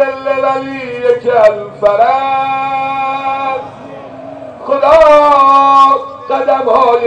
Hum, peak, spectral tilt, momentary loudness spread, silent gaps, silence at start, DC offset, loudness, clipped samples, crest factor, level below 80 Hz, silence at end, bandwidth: none; 0 dBFS; -5 dB/octave; 21 LU; none; 0 s; under 0.1%; -10 LUFS; under 0.1%; 10 dB; -44 dBFS; 0 s; 9 kHz